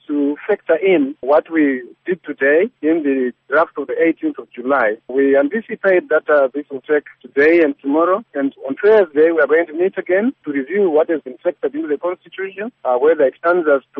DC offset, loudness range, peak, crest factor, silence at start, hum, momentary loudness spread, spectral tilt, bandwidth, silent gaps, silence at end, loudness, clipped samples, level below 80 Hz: under 0.1%; 3 LU; -4 dBFS; 14 dB; 0.1 s; none; 10 LU; -4 dB/octave; 4.7 kHz; none; 0 s; -17 LUFS; under 0.1%; -66 dBFS